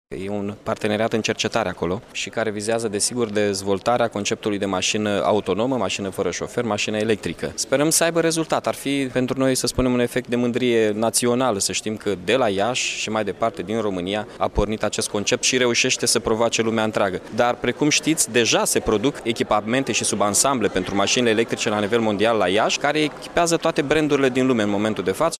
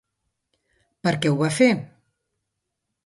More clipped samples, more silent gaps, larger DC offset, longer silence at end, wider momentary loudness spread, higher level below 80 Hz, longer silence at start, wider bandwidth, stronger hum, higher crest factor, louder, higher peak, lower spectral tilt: neither; neither; neither; second, 0.05 s vs 1.2 s; about the same, 7 LU vs 9 LU; first, -44 dBFS vs -64 dBFS; second, 0.1 s vs 1.05 s; first, 15.5 kHz vs 11.5 kHz; neither; about the same, 16 dB vs 20 dB; about the same, -21 LUFS vs -21 LUFS; about the same, -6 dBFS vs -4 dBFS; second, -3.5 dB/octave vs -5.5 dB/octave